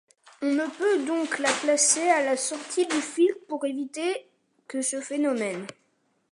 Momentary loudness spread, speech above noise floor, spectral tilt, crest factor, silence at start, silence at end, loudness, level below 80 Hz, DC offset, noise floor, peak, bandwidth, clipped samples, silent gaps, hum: 11 LU; 44 dB; -1.5 dB/octave; 20 dB; 0.4 s; 0.6 s; -25 LUFS; -84 dBFS; under 0.1%; -70 dBFS; -8 dBFS; 11.5 kHz; under 0.1%; none; none